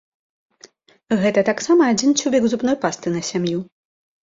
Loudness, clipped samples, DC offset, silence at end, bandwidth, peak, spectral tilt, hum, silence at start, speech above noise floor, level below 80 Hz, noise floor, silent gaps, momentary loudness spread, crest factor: -19 LUFS; under 0.1%; under 0.1%; 0.6 s; 8 kHz; -4 dBFS; -4.5 dB/octave; none; 1.1 s; 32 dB; -60 dBFS; -50 dBFS; none; 8 LU; 16 dB